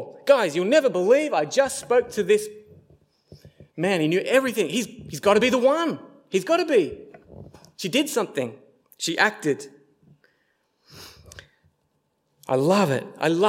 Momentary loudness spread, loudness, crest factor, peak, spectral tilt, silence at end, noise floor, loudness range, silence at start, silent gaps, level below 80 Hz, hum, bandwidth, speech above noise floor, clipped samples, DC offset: 14 LU; -22 LUFS; 20 dB; -4 dBFS; -4.5 dB/octave; 0 s; -71 dBFS; 7 LU; 0 s; none; -62 dBFS; none; 16.5 kHz; 50 dB; under 0.1%; under 0.1%